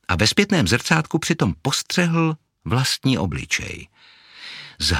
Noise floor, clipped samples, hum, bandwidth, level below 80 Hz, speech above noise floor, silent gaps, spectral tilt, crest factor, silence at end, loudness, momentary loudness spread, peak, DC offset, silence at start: -39 dBFS; under 0.1%; none; 16.5 kHz; -42 dBFS; 19 dB; none; -4 dB/octave; 20 dB; 0 s; -20 LUFS; 17 LU; 0 dBFS; under 0.1%; 0.1 s